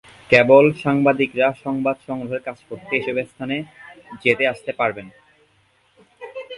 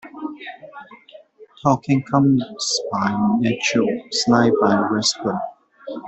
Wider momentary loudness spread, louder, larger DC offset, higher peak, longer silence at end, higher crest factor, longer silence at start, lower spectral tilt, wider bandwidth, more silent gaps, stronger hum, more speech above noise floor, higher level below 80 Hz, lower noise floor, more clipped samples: first, 22 LU vs 18 LU; about the same, -19 LUFS vs -19 LUFS; neither; first, 0 dBFS vs -4 dBFS; about the same, 0 s vs 0 s; about the same, 20 dB vs 16 dB; first, 0.3 s vs 0.05 s; first, -6.5 dB/octave vs -4.5 dB/octave; first, 11.5 kHz vs 8.4 kHz; neither; neither; first, 41 dB vs 27 dB; about the same, -58 dBFS vs -58 dBFS; first, -60 dBFS vs -45 dBFS; neither